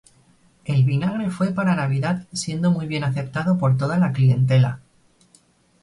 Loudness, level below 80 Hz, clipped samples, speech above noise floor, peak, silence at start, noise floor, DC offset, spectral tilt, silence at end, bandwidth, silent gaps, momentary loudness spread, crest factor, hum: -21 LUFS; -56 dBFS; under 0.1%; 38 dB; -8 dBFS; 0.65 s; -58 dBFS; under 0.1%; -7 dB/octave; 1.05 s; 11.5 kHz; none; 7 LU; 14 dB; none